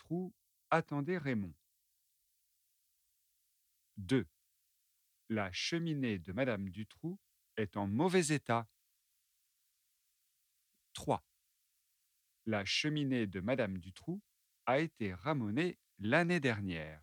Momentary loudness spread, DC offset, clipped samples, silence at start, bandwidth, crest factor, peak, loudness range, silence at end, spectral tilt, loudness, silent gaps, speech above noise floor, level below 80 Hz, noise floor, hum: 14 LU; under 0.1%; under 0.1%; 0.1 s; 18.5 kHz; 22 dB; -16 dBFS; 8 LU; 0.05 s; -5.5 dB/octave; -37 LUFS; none; 44 dB; -72 dBFS; -80 dBFS; none